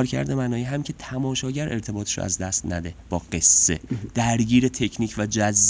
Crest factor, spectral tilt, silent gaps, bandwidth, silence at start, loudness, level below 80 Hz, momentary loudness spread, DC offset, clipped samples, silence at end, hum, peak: 18 dB; -3.5 dB/octave; none; 8 kHz; 0 s; -22 LUFS; -42 dBFS; 13 LU; under 0.1%; under 0.1%; 0 s; none; -4 dBFS